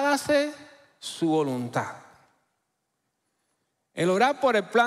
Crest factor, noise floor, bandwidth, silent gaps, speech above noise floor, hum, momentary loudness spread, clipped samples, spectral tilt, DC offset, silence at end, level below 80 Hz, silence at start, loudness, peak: 18 dB; -78 dBFS; 15.5 kHz; none; 54 dB; none; 18 LU; under 0.1%; -4.5 dB/octave; under 0.1%; 0 s; -70 dBFS; 0 s; -25 LUFS; -8 dBFS